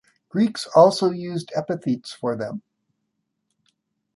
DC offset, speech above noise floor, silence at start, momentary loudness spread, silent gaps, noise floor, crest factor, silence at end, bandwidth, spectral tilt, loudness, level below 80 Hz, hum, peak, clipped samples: under 0.1%; 56 dB; 0.35 s; 14 LU; none; -77 dBFS; 20 dB; 1.55 s; 11.5 kHz; -6 dB/octave; -22 LUFS; -70 dBFS; none; -2 dBFS; under 0.1%